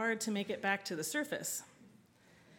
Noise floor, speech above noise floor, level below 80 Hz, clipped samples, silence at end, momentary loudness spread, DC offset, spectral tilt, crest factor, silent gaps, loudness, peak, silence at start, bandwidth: -65 dBFS; 27 dB; -84 dBFS; under 0.1%; 0 s; 6 LU; under 0.1%; -3 dB/octave; 22 dB; none; -37 LUFS; -18 dBFS; 0 s; 18 kHz